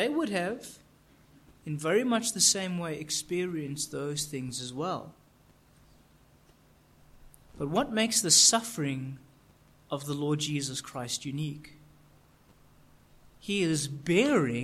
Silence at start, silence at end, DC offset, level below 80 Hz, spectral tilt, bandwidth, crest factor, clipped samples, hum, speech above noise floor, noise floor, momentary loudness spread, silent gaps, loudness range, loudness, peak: 0 s; 0 s; under 0.1%; -62 dBFS; -3 dB/octave; 16 kHz; 24 dB; under 0.1%; none; 32 dB; -61 dBFS; 16 LU; none; 12 LU; -28 LUFS; -8 dBFS